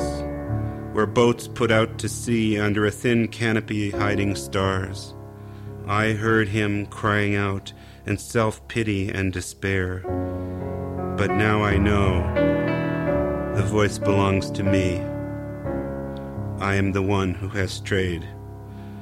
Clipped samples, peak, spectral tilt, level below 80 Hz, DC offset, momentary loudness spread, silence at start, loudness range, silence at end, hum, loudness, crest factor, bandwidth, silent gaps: under 0.1%; -6 dBFS; -6 dB/octave; -40 dBFS; under 0.1%; 12 LU; 0 s; 4 LU; 0 s; none; -23 LUFS; 18 dB; 14.5 kHz; none